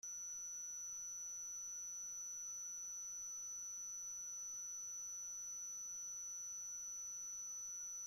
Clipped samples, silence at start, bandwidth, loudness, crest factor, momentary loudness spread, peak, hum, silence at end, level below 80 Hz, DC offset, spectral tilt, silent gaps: under 0.1%; 0.05 s; 16.5 kHz; -46 LUFS; 6 dB; 0 LU; -44 dBFS; none; 0 s; -82 dBFS; under 0.1%; 1.5 dB/octave; none